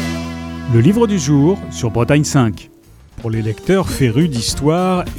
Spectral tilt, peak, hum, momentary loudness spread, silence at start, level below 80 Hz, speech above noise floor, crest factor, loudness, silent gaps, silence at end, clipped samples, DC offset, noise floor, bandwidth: -6 dB/octave; 0 dBFS; none; 11 LU; 0 s; -36 dBFS; 23 dB; 16 dB; -16 LUFS; none; 0 s; under 0.1%; under 0.1%; -38 dBFS; 16 kHz